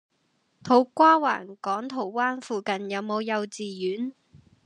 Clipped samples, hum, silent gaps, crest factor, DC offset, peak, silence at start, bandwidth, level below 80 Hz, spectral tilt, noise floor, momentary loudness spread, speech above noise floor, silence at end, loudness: under 0.1%; none; none; 20 dB; under 0.1%; -6 dBFS; 0.65 s; 10.5 kHz; -76 dBFS; -5 dB/octave; -71 dBFS; 13 LU; 46 dB; 0.3 s; -25 LUFS